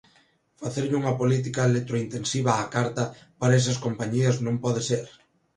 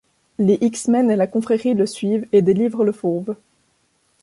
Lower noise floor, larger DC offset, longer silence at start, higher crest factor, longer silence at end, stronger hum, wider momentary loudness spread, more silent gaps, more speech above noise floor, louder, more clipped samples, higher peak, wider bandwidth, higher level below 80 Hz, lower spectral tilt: about the same, -63 dBFS vs -64 dBFS; neither; first, 0.6 s vs 0.4 s; first, 20 dB vs 14 dB; second, 0.5 s vs 0.9 s; neither; about the same, 8 LU vs 9 LU; neither; second, 38 dB vs 46 dB; second, -25 LUFS vs -19 LUFS; neither; about the same, -6 dBFS vs -4 dBFS; about the same, 11 kHz vs 11.5 kHz; about the same, -60 dBFS vs -62 dBFS; second, -5.5 dB/octave vs -7 dB/octave